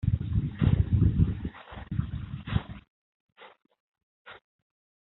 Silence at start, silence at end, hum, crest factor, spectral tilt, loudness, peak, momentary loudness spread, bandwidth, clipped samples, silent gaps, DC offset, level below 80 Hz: 0.05 s; 0.65 s; none; 20 dB; -8.5 dB/octave; -29 LUFS; -10 dBFS; 24 LU; 4.1 kHz; under 0.1%; 2.90-3.36 s, 3.80-3.92 s, 4.03-4.25 s; under 0.1%; -38 dBFS